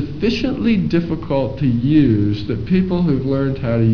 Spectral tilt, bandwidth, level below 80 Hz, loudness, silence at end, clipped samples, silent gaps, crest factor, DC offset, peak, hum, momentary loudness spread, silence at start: -9 dB/octave; 5.4 kHz; -36 dBFS; -17 LUFS; 0 s; under 0.1%; none; 14 dB; 2%; -2 dBFS; none; 6 LU; 0 s